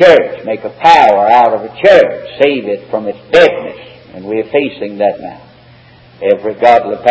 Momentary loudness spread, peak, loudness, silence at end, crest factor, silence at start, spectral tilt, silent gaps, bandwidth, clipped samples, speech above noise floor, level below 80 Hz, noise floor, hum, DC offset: 13 LU; 0 dBFS; -10 LUFS; 0 s; 10 dB; 0 s; -5 dB/octave; none; 8 kHz; 2%; 30 dB; -50 dBFS; -40 dBFS; none; under 0.1%